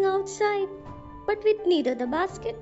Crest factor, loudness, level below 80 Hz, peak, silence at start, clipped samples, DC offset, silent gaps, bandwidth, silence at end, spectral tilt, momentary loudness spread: 14 dB; -26 LUFS; -54 dBFS; -12 dBFS; 0 s; under 0.1%; under 0.1%; none; 8 kHz; 0 s; -3 dB/octave; 11 LU